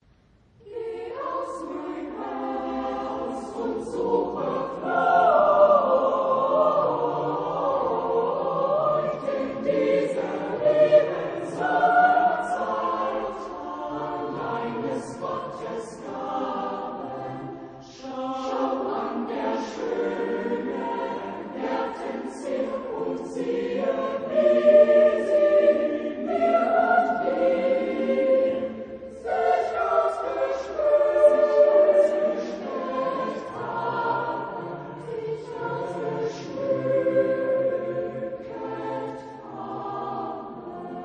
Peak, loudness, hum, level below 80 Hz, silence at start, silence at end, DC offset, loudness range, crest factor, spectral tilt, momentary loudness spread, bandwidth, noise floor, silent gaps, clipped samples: -6 dBFS; -24 LUFS; none; -60 dBFS; 0.65 s; 0 s; under 0.1%; 10 LU; 18 dB; -6.5 dB/octave; 15 LU; 9.6 kHz; -59 dBFS; none; under 0.1%